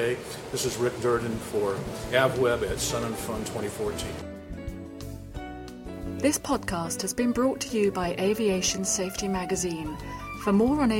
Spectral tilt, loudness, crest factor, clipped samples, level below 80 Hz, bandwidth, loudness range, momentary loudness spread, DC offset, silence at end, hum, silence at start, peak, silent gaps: -4 dB/octave; -27 LUFS; 20 dB; under 0.1%; -46 dBFS; 16.5 kHz; 6 LU; 15 LU; under 0.1%; 0 s; none; 0 s; -8 dBFS; none